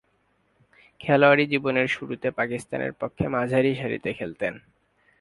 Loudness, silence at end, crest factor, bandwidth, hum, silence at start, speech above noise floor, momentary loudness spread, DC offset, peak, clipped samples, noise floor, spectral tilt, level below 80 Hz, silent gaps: -24 LUFS; 0.6 s; 22 dB; 11.5 kHz; none; 1 s; 44 dB; 13 LU; under 0.1%; -4 dBFS; under 0.1%; -68 dBFS; -6.5 dB/octave; -56 dBFS; none